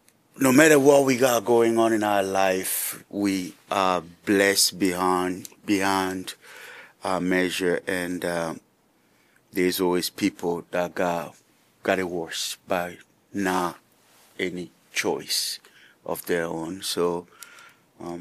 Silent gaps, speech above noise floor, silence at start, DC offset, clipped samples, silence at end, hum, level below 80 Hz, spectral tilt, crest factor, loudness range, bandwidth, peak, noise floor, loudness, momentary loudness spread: none; 40 dB; 0.4 s; under 0.1%; under 0.1%; 0 s; none; -66 dBFS; -3.5 dB/octave; 24 dB; 7 LU; 15.5 kHz; 0 dBFS; -63 dBFS; -24 LUFS; 16 LU